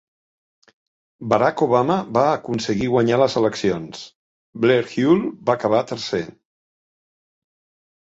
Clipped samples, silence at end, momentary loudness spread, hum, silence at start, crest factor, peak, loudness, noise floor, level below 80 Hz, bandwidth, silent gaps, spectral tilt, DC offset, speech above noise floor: under 0.1%; 1.7 s; 9 LU; none; 1.2 s; 20 dB; -2 dBFS; -20 LUFS; under -90 dBFS; -56 dBFS; 8 kHz; 4.15-4.53 s; -6 dB/octave; under 0.1%; over 71 dB